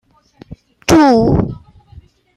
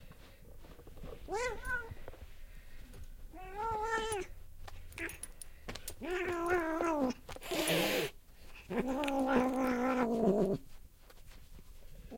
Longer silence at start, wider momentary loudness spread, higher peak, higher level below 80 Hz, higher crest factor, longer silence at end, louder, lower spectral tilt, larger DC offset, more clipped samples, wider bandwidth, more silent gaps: first, 0.5 s vs 0 s; second, 15 LU vs 23 LU; first, 0 dBFS vs -16 dBFS; first, -34 dBFS vs -52 dBFS; second, 16 dB vs 22 dB; first, 0.8 s vs 0 s; first, -12 LUFS vs -35 LUFS; first, -6 dB/octave vs -4.5 dB/octave; neither; neither; second, 14.5 kHz vs 16.5 kHz; neither